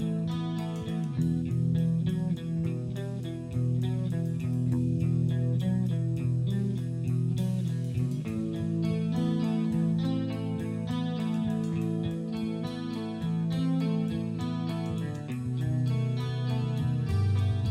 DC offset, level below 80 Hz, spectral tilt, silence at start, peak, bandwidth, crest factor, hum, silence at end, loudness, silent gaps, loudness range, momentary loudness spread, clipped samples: under 0.1%; -52 dBFS; -8.5 dB/octave; 0 s; -16 dBFS; 11.5 kHz; 12 dB; none; 0 s; -30 LUFS; none; 2 LU; 6 LU; under 0.1%